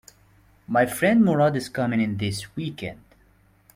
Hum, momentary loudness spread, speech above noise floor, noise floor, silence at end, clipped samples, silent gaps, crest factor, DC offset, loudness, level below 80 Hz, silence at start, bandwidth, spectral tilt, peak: none; 14 LU; 36 dB; -59 dBFS; 0.8 s; under 0.1%; none; 18 dB; under 0.1%; -23 LUFS; -58 dBFS; 0.7 s; 16.5 kHz; -6 dB/octave; -6 dBFS